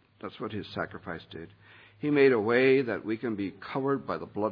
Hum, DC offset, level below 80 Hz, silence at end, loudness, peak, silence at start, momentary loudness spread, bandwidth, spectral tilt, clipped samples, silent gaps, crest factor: none; under 0.1%; -68 dBFS; 0 s; -28 LUFS; -10 dBFS; 0.25 s; 18 LU; 5.2 kHz; -9 dB/octave; under 0.1%; none; 18 dB